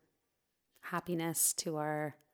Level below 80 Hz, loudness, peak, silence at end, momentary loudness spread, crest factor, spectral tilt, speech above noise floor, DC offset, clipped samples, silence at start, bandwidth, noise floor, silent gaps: -78 dBFS; -35 LUFS; -18 dBFS; 0.2 s; 10 LU; 20 dB; -3 dB/octave; 47 dB; under 0.1%; under 0.1%; 0.85 s; 19.5 kHz; -83 dBFS; none